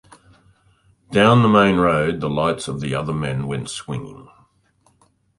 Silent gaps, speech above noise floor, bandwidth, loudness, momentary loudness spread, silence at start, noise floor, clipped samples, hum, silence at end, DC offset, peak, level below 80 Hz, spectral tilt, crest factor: none; 42 dB; 11.5 kHz; -19 LUFS; 15 LU; 1.1 s; -61 dBFS; under 0.1%; none; 1.2 s; under 0.1%; -2 dBFS; -48 dBFS; -6 dB/octave; 18 dB